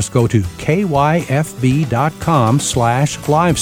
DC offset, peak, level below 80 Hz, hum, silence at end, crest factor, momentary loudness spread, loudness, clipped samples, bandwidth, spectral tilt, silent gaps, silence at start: under 0.1%; 0 dBFS; -38 dBFS; none; 0 s; 14 dB; 3 LU; -15 LUFS; under 0.1%; 16.5 kHz; -5.5 dB/octave; none; 0 s